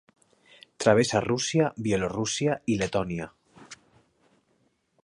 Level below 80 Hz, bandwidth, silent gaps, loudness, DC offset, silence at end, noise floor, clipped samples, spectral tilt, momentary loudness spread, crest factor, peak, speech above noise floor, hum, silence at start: -56 dBFS; 11.5 kHz; none; -26 LUFS; under 0.1%; 1.3 s; -70 dBFS; under 0.1%; -4.5 dB/octave; 20 LU; 24 dB; -6 dBFS; 45 dB; none; 0.8 s